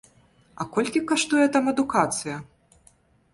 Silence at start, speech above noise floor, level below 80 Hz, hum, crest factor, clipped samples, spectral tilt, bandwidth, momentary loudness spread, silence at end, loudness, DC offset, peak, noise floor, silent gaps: 0.6 s; 36 dB; -62 dBFS; none; 18 dB; under 0.1%; -3.5 dB/octave; 11.5 kHz; 14 LU; 0.9 s; -23 LUFS; under 0.1%; -6 dBFS; -60 dBFS; none